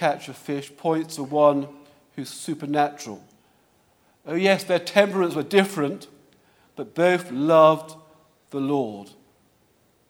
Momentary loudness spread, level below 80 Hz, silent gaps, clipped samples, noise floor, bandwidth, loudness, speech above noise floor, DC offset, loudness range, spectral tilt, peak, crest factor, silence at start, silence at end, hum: 19 LU; -74 dBFS; none; under 0.1%; -63 dBFS; 17.5 kHz; -22 LUFS; 40 dB; under 0.1%; 5 LU; -5.5 dB/octave; 0 dBFS; 24 dB; 0 s; 1.05 s; none